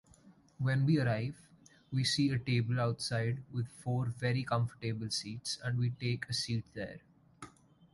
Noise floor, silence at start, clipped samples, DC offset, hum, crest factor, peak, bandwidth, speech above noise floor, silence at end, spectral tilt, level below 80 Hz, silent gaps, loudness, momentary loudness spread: -62 dBFS; 0.25 s; under 0.1%; under 0.1%; none; 16 dB; -18 dBFS; 11.5 kHz; 28 dB; 0.45 s; -5.5 dB/octave; -64 dBFS; none; -34 LUFS; 14 LU